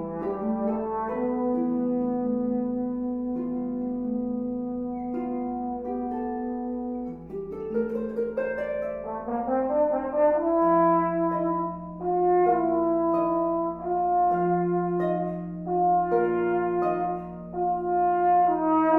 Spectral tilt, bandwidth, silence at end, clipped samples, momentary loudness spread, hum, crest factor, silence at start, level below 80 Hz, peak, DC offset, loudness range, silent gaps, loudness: -11 dB/octave; 3.3 kHz; 0 s; under 0.1%; 10 LU; none; 16 dB; 0 s; -54 dBFS; -10 dBFS; under 0.1%; 7 LU; none; -26 LUFS